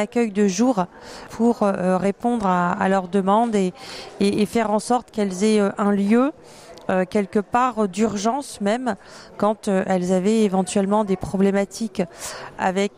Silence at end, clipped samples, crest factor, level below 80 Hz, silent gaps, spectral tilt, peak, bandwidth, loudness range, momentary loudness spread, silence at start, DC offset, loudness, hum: 0.1 s; under 0.1%; 14 dB; -54 dBFS; none; -6 dB/octave; -8 dBFS; 15 kHz; 2 LU; 8 LU; 0 s; under 0.1%; -21 LUFS; none